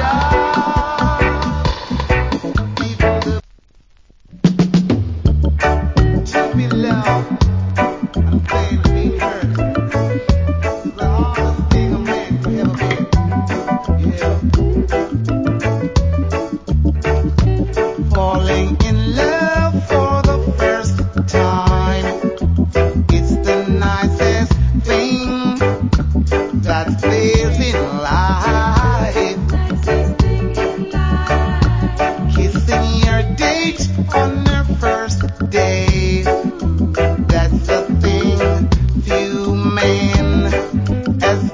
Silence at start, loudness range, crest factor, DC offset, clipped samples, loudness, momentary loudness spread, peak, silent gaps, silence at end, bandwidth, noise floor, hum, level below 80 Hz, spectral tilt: 0 s; 2 LU; 14 dB; under 0.1%; under 0.1%; -16 LUFS; 4 LU; 0 dBFS; none; 0 s; 7.6 kHz; -48 dBFS; none; -20 dBFS; -6.5 dB/octave